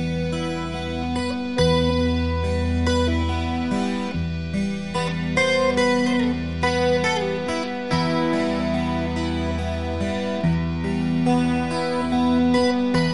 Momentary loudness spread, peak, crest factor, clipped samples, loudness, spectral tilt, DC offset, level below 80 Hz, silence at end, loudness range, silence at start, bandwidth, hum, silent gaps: 7 LU; -6 dBFS; 16 dB; under 0.1%; -22 LUFS; -6 dB/octave; 0.8%; -36 dBFS; 0 s; 2 LU; 0 s; 11.5 kHz; none; none